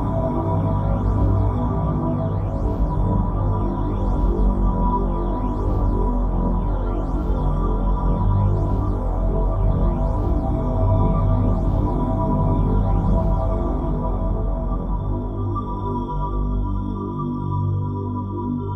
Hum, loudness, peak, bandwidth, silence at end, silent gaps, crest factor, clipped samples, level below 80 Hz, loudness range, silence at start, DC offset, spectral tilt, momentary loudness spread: 50 Hz at -35 dBFS; -22 LUFS; -6 dBFS; 3.7 kHz; 0 s; none; 14 dB; under 0.1%; -22 dBFS; 4 LU; 0 s; under 0.1%; -11 dB/octave; 6 LU